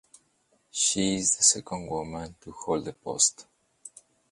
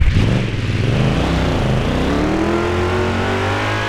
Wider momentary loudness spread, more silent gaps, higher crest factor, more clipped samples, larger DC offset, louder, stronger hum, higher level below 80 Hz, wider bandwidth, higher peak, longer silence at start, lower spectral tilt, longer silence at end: first, 18 LU vs 2 LU; neither; first, 24 dB vs 14 dB; neither; neither; second, -25 LUFS vs -17 LUFS; neither; second, -58 dBFS vs -24 dBFS; about the same, 11.5 kHz vs 12.5 kHz; second, -6 dBFS vs -2 dBFS; first, 0.75 s vs 0 s; second, -2 dB/octave vs -6.5 dB/octave; first, 0.45 s vs 0 s